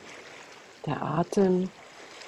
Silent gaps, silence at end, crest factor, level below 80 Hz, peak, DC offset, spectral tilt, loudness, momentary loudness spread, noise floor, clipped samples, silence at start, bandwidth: none; 0 s; 18 dB; -64 dBFS; -12 dBFS; under 0.1%; -7 dB/octave; -28 LUFS; 22 LU; -48 dBFS; under 0.1%; 0 s; 12 kHz